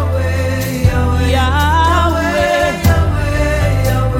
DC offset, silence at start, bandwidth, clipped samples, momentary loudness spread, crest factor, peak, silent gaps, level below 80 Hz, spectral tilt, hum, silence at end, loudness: under 0.1%; 0 s; 17 kHz; under 0.1%; 4 LU; 12 dB; 0 dBFS; none; -20 dBFS; -6 dB/octave; none; 0 s; -14 LUFS